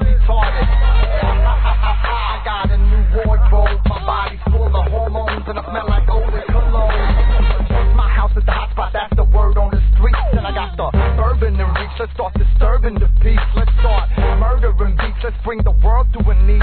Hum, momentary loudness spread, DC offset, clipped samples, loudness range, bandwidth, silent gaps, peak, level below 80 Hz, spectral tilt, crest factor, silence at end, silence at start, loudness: none; 6 LU; 0.3%; under 0.1%; 1 LU; 4.5 kHz; none; -2 dBFS; -14 dBFS; -10.5 dB/octave; 12 dB; 0 s; 0 s; -17 LUFS